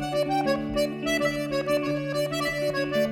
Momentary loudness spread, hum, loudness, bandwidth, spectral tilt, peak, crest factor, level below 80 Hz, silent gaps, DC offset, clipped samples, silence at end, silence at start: 2 LU; none; -26 LUFS; 18 kHz; -5 dB/octave; -12 dBFS; 14 dB; -50 dBFS; none; under 0.1%; under 0.1%; 0 s; 0 s